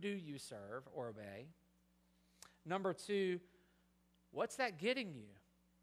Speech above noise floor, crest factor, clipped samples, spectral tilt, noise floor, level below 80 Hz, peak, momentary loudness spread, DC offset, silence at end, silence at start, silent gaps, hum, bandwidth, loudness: 32 dB; 22 dB; under 0.1%; -4.5 dB/octave; -76 dBFS; -82 dBFS; -24 dBFS; 19 LU; under 0.1%; 0.45 s; 0 s; none; none; 15.5 kHz; -43 LUFS